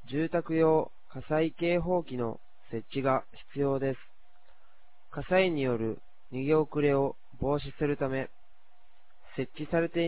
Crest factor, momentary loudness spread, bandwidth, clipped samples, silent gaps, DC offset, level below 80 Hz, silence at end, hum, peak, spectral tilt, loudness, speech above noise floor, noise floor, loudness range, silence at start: 20 dB; 16 LU; 4 kHz; under 0.1%; none; 0.8%; -54 dBFS; 0 s; none; -12 dBFS; -6 dB/octave; -30 LUFS; 37 dB; -66 dBFS; 3 LU; 0.1 s